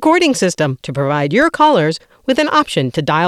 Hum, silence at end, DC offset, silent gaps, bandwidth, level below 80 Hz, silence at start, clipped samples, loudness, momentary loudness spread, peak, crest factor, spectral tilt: none; 0 s; under 0.1%; none; 14 kHz; -50 dBFS; 0 s; under 0.1%; -14 LUFS; 7 LU; 0 dBFS; 14 dB; -5 dB/octave